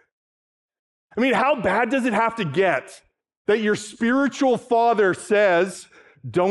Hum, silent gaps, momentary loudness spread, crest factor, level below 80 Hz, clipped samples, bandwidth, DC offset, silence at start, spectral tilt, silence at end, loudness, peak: none; 3.37-3.45 s; 9 LU; 16 dB; -62 dBFS; under 0.1%; 12 kHz; under 0.1%; 1.15 s; -5 dB/octave; 0 s; -21 LUFS; -6 dBFS